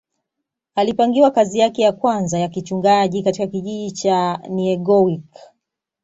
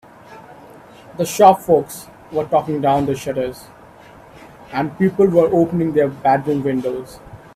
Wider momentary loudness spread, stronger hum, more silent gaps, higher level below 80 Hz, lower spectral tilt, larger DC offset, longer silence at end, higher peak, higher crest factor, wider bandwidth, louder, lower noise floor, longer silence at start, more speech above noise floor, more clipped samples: second, 9 LU vs 16 LU; neither; neither; second, -60 dBFS vs -52 dBFS; about the same, -5.5 dB/octave vs -6.5 dB/octave; neither; first, 0.6 s vs 0.2 s; about the same, -2 dBFS vs 0 dBFS; about the same, 16 dB vs 18 dB; second, 8 kHz vs 16 kHz; about the same, -18 LUFS vs -17 LUFS; first, -80 dBFS vs -43 dBFS; first, 0.75 s vs 0.3 s; first, 63 dB vs 26 dB; neither